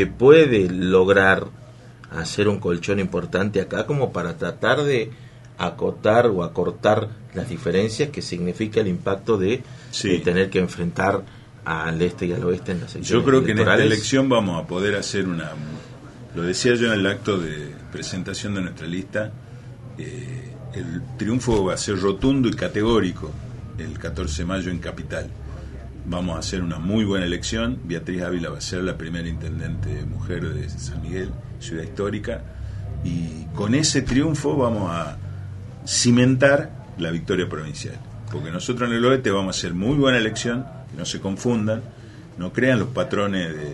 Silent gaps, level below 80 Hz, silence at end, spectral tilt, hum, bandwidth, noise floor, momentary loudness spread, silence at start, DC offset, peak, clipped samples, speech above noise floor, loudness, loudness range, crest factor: none; -40 dBFS; 0 s; -5 dB/octave; none; 11.5 kHz; -43 dBFS; 16 LU; 0 s; under 0.1%; 0 dBFS; under 0.1%; 21 dB; -22 LUFS; 9 LU; 22 dB